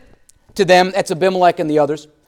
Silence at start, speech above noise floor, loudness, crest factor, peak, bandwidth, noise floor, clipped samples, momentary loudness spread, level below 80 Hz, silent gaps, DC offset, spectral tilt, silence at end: 0.55 s; 34 dB; -15 LUFS; 16 dB; 0 dBFS; 16.5 kHz; -49 dBFS; under 0.1%; 8 LU; -54 dBFS; none; under 0.1%; -5 dB/octave; 0.25 s